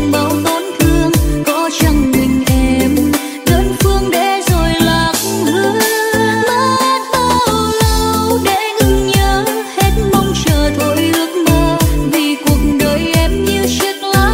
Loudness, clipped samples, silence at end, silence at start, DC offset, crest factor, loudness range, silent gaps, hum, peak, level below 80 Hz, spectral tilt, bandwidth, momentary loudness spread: -13 LUFS; under 0.1%; 0 s; 0 s; under 0.1%; 12 dB; 1 LU; none; none; 0 dBFS; -20 dBFS; -4.5 dB/octave; 16.5 kHz; 2 LU